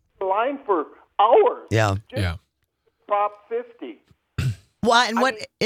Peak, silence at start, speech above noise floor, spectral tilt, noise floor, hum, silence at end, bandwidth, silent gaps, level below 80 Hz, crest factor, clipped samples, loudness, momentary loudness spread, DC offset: -2 dBFS; 0.2 s; 49 dB; -5 dB/octave; -70 dBFS; none; 0 s; 15.5 kHz; none; -52 dBFS; 20 dB; under 0.1%; -22 LUFS; 15 LU; under 0.1%